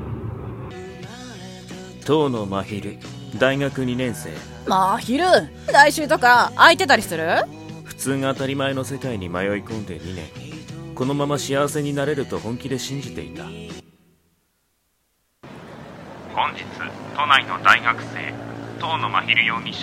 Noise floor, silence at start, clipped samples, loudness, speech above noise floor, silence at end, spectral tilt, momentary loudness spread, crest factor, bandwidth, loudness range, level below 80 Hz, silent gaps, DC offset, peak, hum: -68 dBFS; 0 s; under 0.1%; -20 LUFS; 48 dB; 0 s; -4 dB/octave; 21 LU; 22 dB; 16 kHz; 16 LU; -50 dBFS; none; under 0.1%; 0 dBFS; none